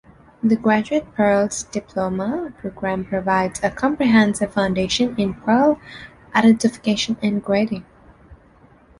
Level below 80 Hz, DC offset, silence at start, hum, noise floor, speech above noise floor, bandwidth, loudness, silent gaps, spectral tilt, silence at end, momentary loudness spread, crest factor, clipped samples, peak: -48 dBFS; under 0.1%; 0.45 s; none; -51 dBFS; 32 dB; 11.5 kHz; -20 LUFS; none; -5 dB/octave; 0.65 s; 11 LU; 18 dB; under 0.1%; -2 dBFS